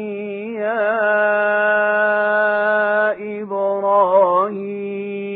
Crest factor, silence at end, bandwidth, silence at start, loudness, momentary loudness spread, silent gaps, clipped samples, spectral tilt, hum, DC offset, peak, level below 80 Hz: 14 dB; 0 s; 4.4 kHz; 0 s; -17 LUFS; 11 LU; none; under 0.1%; -9 dB/octave; none; under 0.1%; -4 dBFS; -72 dBFS